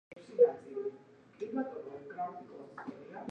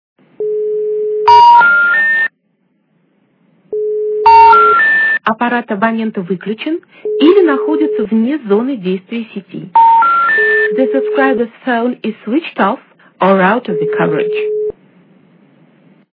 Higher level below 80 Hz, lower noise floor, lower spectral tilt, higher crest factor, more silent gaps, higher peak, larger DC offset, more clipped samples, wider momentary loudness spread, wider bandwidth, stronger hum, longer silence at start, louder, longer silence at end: second, -84 dBFS vs -54 dBFS; about the same, -57 dBFS vs -60 dBFS; about the same, -7.5 dB/octave vs -7 dB/octave; first, 22 dB vs 12 dB; neither; second, -14 dBFS vs 0 dBFS; neither; second, under 0.1% vs 0.3%; first, 18 LU vs 14 LU; about the same, 5.8 kHz vs 5.4 kHz; neither; second, 0.1 s vs 0.4 s; second, -35 LUFS vs -11 LUFS; second, 0 s vs 1.4 s